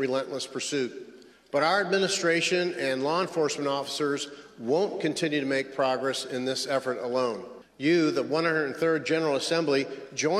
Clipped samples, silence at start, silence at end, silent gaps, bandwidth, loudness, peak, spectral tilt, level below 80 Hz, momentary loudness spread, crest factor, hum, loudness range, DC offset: under 0.1%; 0 s; 0 s; none; 14 kHz; -27 LUFS; -12 dBFS; -4 dB/octave; -74 dBFS; 7 LU; 16 dB; none; 2 LU; under 0.1%